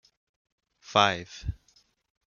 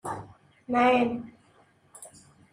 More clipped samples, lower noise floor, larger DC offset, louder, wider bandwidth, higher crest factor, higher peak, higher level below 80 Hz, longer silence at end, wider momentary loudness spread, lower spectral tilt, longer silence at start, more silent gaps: neither; first, -66 dBFS vs -61 dBFS; neither; about the same, -26 LUFS vs -25 LUFS; second, 7.2 kHz vs 15 kHz; first, 26 dB vs 18 dB; first, -6 dBFS vs -10 dBFS; first, -48 dBFS vs -66 dBFS; first, 0.75 s vs 0.45 s; second, 17 LU vs 25 LU; second, -3.5 dB/octave vs -5 dB/octave; first, 0.9 s vs 0.05 s; neither